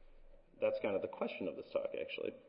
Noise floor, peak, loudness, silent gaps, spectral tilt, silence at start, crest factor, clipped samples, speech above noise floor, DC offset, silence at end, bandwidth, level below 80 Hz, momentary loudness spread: -59 dBFS; -22 dBFS; -40 LUFS; none; -3.5 dB/octave; 0 s; 18 dB; under 0.1%; 19 dB; under 0.1%; 0 s; 5.4 kHz; -66 dBFS; 5 LU